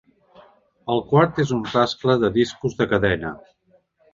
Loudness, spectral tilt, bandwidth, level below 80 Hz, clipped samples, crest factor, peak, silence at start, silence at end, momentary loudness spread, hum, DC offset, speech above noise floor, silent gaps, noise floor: -21 LUFS; -6.5 dB/octave; 7.6 kHz; -48 dBFS; under 0.1%; 20 dB; -2 dBFS; 0.85 s; 0.75 s; 10 LU; none; under 0.1%; 40 dB; none; -60 dBFS